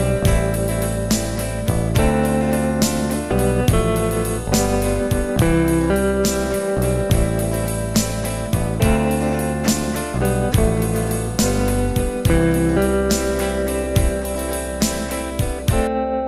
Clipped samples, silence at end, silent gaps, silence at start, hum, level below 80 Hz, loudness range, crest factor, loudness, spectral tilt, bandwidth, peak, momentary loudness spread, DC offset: under 0.1%; 0 s; none; 0 s; none; -26 dBFS; 1 LU; 16 dB; -19 LUFS; -5.5 dB/octave; 16 kHz; -2 dBFS; 5 LU; under 0.1%